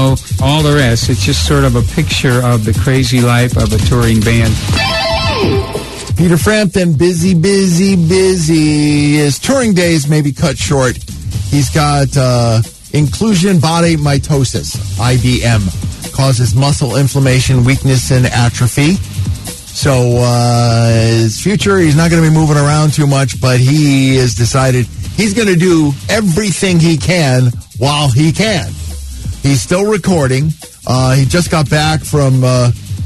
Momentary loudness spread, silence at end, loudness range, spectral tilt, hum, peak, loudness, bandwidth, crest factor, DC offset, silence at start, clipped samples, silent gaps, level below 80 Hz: 6 LU; 0 s; 3 LU; -5.5 dB/octave; none; 0 dBFS; -11 LUFS; 12.5 kHz; 10 dB; under 0.1%; 0 s; under 0.1%; none; -26 dBFS